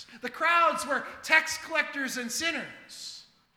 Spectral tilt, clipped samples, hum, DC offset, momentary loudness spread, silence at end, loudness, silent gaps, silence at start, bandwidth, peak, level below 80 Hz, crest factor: -1 dB/octave; under 0.1%; none; under 0.1%; 18 LU; 0.35 s; -27 LUFS; none; 0 s; 18 kHz; -6 dBFS; -70 dBFS; 24 dB